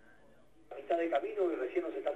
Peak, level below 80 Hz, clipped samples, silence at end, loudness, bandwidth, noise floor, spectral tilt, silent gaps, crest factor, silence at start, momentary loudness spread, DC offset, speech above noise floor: -18 dBFS; -74 dBFS; under 0.1%; 0 s; -34 LUFS; 8.6 kHz; -64 dBFS; -5.5 dB/octave; none; 18 dB; 0.7 s; 13 LU; under 0.1%; 30 dB